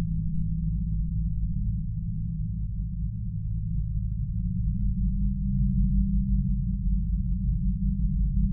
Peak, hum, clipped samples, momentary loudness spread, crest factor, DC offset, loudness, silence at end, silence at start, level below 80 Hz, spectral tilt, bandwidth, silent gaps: -14 dBFS; none; under 0.1%; 6 LU; 12 dB; under 0.1%; -29 LUFS; 0 s; 0 s; -28 dBFS; -15.5 dB/octave; 0.3 kHz; none